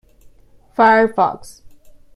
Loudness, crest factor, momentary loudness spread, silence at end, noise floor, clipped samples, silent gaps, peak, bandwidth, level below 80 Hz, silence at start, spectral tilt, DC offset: -15 LUFS; 16 dB; 18 LU; 0.45 s; -47 dBFS; under 0.1%; none; -2 dBFS; 12.5 kHz; -52 dBFS; 0.8 s; -5.5 dB/octave; under 0.1%